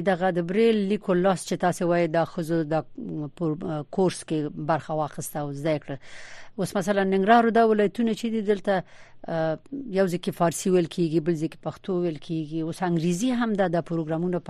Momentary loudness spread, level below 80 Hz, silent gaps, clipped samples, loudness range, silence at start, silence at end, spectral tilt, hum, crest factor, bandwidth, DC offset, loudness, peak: 10 LU; -58 dBFS; none; under 0.1%; 5 LU; 0 s; 0 s; -6 dB/octave; none; 20 dB; 13 kHz; under 0.1%; -25 LUFS; -4 dBFS